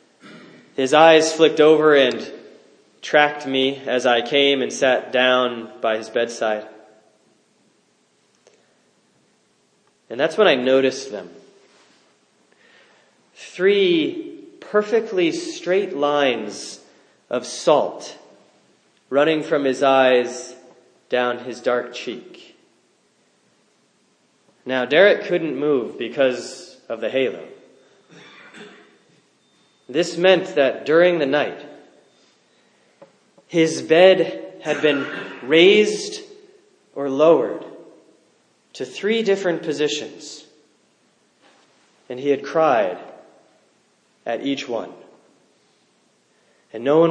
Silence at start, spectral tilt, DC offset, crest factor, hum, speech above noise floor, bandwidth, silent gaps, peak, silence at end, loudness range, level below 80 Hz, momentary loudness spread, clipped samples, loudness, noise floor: 0.25 s; -4 dB/octave; under 0.1%; 22 dB; none; 44 dB; 10 kHz; none; 0 dBFS; 0 s; 10 LU; -80 dBFS; 21 LU; under 0.1%; -19 LUFS; -62 dBFS